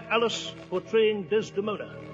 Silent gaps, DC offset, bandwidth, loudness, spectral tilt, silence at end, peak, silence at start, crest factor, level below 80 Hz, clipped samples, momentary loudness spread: none; under 0.1%; 7.8 kHz; -28 LUFS; -4 dB/octave; 0 s; -10 dBFS; 0 s; 18 dB; -64 dBFS; under 0.1%; 9 LU